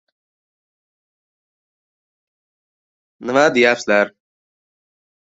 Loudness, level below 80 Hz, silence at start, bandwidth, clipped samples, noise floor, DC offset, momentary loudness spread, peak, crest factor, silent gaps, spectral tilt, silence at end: -16 LUFS; -68 dBFS; 3.2 s; 8 kHz; under 0.1%; under -90 dBFS; under 0.1%; 10 LU; -2 dBFS; 20 dB; none; -4 dB/octave; 1.25 s